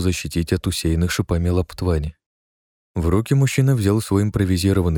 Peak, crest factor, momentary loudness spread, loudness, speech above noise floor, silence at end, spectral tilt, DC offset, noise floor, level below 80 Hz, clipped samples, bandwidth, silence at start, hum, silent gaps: -4 dBFS; 16 dB; 6 LU; -20 LUFS; over 71 dB; 0 s; -6 dB/octave; under 0.1%; under -90 dBFS; -32 dBFS; under 0.1%; 18 kHz; 0 s; none; 2.26-2.95 s